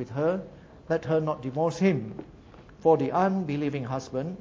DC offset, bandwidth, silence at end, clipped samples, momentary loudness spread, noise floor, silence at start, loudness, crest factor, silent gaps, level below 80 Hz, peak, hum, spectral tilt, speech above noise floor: under 0.1%; 7.6 kHz; 0 s; under 0.1%; 10 LU; -49 dBFS; 0 s; -27 LUFS; 18 dB; none; -58 dBFS; -8 dBFS; none; -7.5 dB/octave; 23 dB